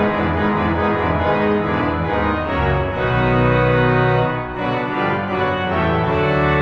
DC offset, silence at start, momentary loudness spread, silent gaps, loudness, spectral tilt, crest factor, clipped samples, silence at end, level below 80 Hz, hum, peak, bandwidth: under 0.1%; 0 s; 5 LU; none; -18 LUFS; -8.5 dB/octave; 14 dB; under 0.1%; 0 s; -34 dBFS; none; -4 dBFS; 6.4 kHz